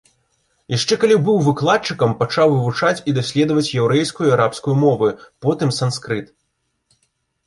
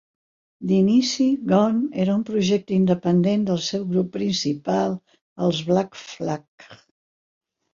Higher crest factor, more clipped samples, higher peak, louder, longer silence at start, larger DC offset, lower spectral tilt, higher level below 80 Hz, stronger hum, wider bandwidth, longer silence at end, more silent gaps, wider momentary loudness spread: about the same, 16 dB vs 18 dB; neither; about the same, -2 dBFS vs -4 dBFS; first, -17 LUFS vs -22 LUFS; about the same, 0.7 s vs 0.6 s; neither; about the same, -5.5 dB/octave vs -6 dB/octave; first, -56 dBFS vs -62 dBFS; neither; first, 11.5 kHz vs 7.6 kHz; first, 1.2 s vs 1 s; second, none vs 5.22-5.36 s, 6.48-6.58 s; second, 7 LU vs 10 LU